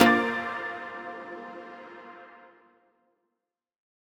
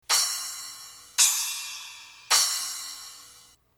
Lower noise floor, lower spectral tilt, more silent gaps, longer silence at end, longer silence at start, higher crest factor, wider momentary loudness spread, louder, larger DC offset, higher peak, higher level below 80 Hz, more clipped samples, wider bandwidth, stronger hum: first, -86 dBFS vs -55 dBFS; first, -4 dB/octave vs 4.5 dB/octave; neither; first, 1.55 s vs 0.4 s; about the same, 0 s vs 0.1 s; about the same, 28 dB vs 24 dB; about the same, 21 LU vs 21 LU; second, -30 LUFS vs -24 LUFS; neither; about the same, -4 dBFS vs -6 dBFS; first, -66 dBFS vs -72 dBFS; neither; second, 16.5 kHz vs 19.5 kHz; neither